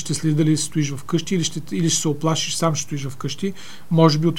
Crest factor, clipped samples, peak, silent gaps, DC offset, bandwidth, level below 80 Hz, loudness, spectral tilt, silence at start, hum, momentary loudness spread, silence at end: 20 dB; under 0.1%; 0 dBFS; none; 3%; 16 kHz; -58 dBFS; -21 LUFS; -5 dB/octave; 0 s; none; 11 LU; 0 s